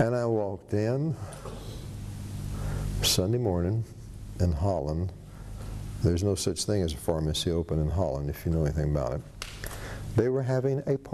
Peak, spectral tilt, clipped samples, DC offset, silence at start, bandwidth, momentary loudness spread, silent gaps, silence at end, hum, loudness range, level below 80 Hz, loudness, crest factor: -10 dBFS; -5.5 dB/octave; under 0.1%; under 0.1%; 0 s; 13 kHz; 14 LU; none; 0 s; none; 2 LU; -40 dBFS; -29 LUFS; 18 dB